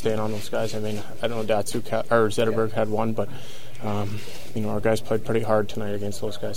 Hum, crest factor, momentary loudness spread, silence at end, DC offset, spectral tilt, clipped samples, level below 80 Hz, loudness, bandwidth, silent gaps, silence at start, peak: none; 20 dB; 10 LU; 0 s; 6%; -5.5 dB/octave; under 0.1%; -50 dBFS; -26 LUFS; 16.5 kHz; none; 0 s; -6 dBFS